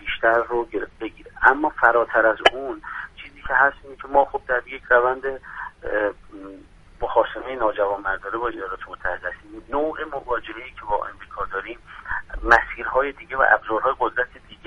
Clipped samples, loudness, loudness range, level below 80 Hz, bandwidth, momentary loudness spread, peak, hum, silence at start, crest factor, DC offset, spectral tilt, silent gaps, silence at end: under 0.1%; -22 LUFS; 8 LU; -44 dBFS; 10.5 kHz; 17 LU; 0 dBFS; none; 0 s; 22 dB; under 0.1%; -4.5 dB/octave; none; 0.1 s